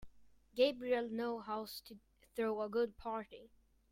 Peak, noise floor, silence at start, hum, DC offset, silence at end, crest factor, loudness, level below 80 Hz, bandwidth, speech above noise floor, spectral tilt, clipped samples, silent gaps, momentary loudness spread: -18 dBFS; -63 dBFS; 0 s; none; under 0.1%; 0.45 s; 22 dB; -39 LUFS; -70 dBFS; 16 kHz; 25 dB; -4.5 dB/octave; under 0.1%; none; 16 LU